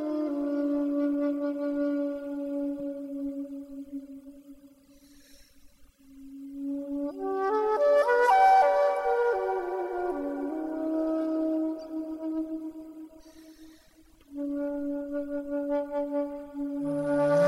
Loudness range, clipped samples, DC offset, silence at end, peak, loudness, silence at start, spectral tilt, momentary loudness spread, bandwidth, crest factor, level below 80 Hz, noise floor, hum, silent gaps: 16 LU; under 0.1%; under 0.1%; 0 s; -12 dBFS; -28 LUFS; 0 s; -6.5 dB/octave; 18 LU; 12.5 kHz; 16 dB; -64 dBFS; -58 dBFS; none; none